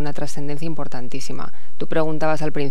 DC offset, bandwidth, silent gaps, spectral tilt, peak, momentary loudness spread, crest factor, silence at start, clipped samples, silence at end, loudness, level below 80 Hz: 30%; 15 kHz; none; -6 dB/octave; -4 dBFS; 12 LU; 18 dB; 0 s; under 0.1%; 0 s; -27 LUFS; -56 dBFS